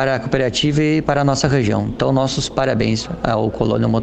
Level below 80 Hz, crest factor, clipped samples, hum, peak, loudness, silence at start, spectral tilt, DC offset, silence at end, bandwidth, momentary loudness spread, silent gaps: -38 dBFS; 18 dB; under 0.1%; none; 0 dBFS; -18 LUFS; 0 s; -5.5 dB/octave; under 0.1%; 0 s; 9 kHz; 3 LU; none